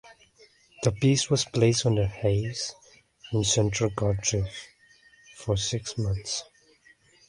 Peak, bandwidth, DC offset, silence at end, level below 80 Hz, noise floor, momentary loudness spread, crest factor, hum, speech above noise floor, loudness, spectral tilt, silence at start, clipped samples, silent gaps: -8 dBFS; 11.5 kHz; under 0.1%; 0.85 s; -46 dBFS; -59 dBFS; 11 LU; 20 dB; none; 34 dB; -26 LUFS; -4.5 dB/octave; 0.05 s; under 0.1%; none